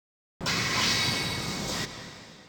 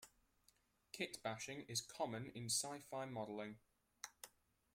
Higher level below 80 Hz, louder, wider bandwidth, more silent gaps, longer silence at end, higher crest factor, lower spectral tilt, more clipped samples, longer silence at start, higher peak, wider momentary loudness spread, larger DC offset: first, -52 dBFS vs -82 dBFS; first, -27 LUFS vs -46 LUFS; first, over 20 kHz vs 16.5 kHz; neither; second, 0 s vs 0.45 s; second, 16 dB vs 22 dB; about the same, -2.5 dB/octave vs -2.5 dB/octave; neither; first, 0.4 s vs 0 s; first, -14 dBFS vs -28 dBFS; second, 13 LU vs 18 LU; neither